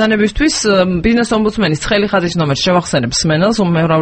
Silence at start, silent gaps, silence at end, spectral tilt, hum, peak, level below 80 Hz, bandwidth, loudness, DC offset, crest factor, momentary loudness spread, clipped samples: 0 s; none; 0 s; -5 dB/octave; none; 0 dBFS; -32 dBFS; 8.8 kHz; -13 LUFS; under 0.1%; 12 dB; 2 LU; under 0.1%